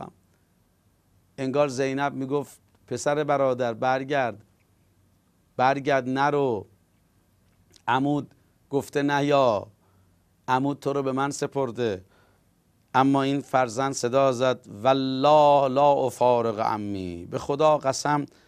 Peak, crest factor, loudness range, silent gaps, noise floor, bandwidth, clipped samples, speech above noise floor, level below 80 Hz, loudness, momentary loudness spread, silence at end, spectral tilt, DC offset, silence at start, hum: -6 dBFS; 18 dB; 6 LU; none; -65 dBFS; 14.5 kHz; under 0.1%; 41 dB; -66 dBFS; -24 LUFS; 10 LU; 0.2 s; -5.5 dB/octave; under 0.1%; 0 s; none